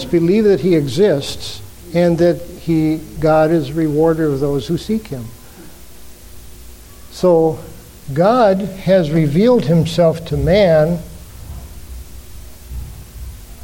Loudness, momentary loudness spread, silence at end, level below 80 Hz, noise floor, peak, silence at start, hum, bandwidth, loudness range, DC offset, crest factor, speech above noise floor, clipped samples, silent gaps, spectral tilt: -15 LUFS; 22 LU; 0.05 s; -36 dBFS; -38 dBFS; -2 dBFS; 0 s; none; 17 kHz; 7 LU; under 0.1%; 14 dB; 24 dB; under 0.1%; none; -7 dB/octave